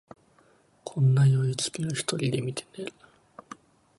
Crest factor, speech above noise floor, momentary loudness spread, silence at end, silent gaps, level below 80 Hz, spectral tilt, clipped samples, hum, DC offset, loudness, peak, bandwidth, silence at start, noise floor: 16 dB; 36 dB; 25 LU; 1.1 s; none; -66 dBFS; -5.5 dB/octave; under 0.1%; none; under 0.1%; -26 LUFS; -12 dBFS; 11.5 kHz; 0.85 s; -62 dBFS